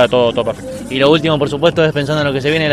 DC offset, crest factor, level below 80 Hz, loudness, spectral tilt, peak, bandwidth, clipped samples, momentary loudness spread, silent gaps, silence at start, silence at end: under 0.1%; 14 dB; -42 dBFS; -14 LUFS; -6 dB/octave; 0 dBFS; 13.5 kHz; under 0.1%; 9 LU; none; 0 s; 0 s